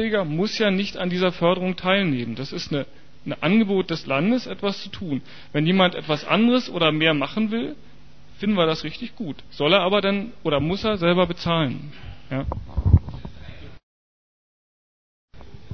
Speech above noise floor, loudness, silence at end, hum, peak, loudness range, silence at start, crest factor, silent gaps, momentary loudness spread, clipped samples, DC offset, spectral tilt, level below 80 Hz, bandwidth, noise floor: over 68 dB; -22 LUFS; 0.25 s; none; -2 dBFS; 5 LU; 0 s; 20 dB; 13.83-15.28 s; 14 LU; under 0.1%; 1%; -6.5 dB/octave; -38 dBFS; 6.6 kHz; under -90 dBFS